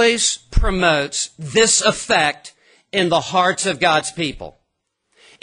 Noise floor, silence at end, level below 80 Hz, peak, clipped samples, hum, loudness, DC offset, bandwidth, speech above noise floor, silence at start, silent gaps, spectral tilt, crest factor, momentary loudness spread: -73 dBFS; 0.95 s; -30 dBFS; 0 dBFS; under 0.1%; none; -17 LUFS; under 0.1%; 11 kHz; 56 dB; 0 s; none; -2.5 dB/octave; 18 dB; 11 LU